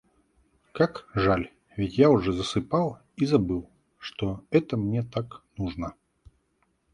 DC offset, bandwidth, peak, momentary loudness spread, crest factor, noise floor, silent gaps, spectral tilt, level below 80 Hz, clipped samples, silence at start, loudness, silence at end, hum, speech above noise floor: under 0.1%; 11 kHz; -6 dBFS; 16 LU; 22 dB; -71 dBFS; none; -7 dB/octave; -48 dBFS; under 0.1%; 0.75 s; -26 LUFS; 1.05 s; none; 46 dB